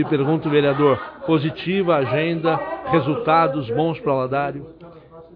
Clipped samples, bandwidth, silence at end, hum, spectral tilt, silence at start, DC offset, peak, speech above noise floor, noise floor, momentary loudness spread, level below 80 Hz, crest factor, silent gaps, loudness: under 0.1%; 5.2 kHz; 0.15 s; none; -10 dB/octave; 0 s; under 0.1%; -4 dBFS; 23 dB; -42 dBFS; 7 LU; -54 dBFS; 16 dB; none; -20 LUFS